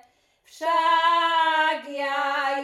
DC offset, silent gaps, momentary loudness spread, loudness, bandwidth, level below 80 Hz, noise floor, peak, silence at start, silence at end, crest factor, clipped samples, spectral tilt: under 0.1%; none; 8 LU; -22 LUFS; 12.5 kHz; -76 dBFS; -60 dBFS; -10 dBFS; 0.55 s; 0 s; 14 dB; under 0.1%; 0 dB/octave